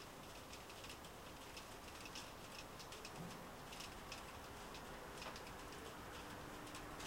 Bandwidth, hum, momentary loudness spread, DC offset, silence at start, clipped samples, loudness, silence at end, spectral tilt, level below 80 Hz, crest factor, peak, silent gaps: 16.5 kHz; none; 3 LU; under 0.1%; 0 s; under 0.1%; -53 LUFS; 0 s; -3 dB/octave; -64 dBFS; 18 dB; -36 dBFS; none